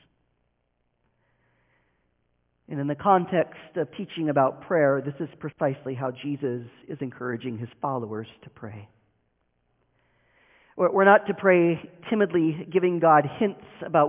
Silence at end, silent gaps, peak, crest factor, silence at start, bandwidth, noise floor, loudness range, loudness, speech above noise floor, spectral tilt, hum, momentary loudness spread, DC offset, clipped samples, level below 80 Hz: 0 s; none; -4 dBFS; 22 dB; 2.7 s; 3.8 kHz; -74 dBFS; 13 LU; -24 LUFS; 49 dB; -10.5 dB/octave; none; 17 LU; under 0.1%; under 0.1%; -68 dBFS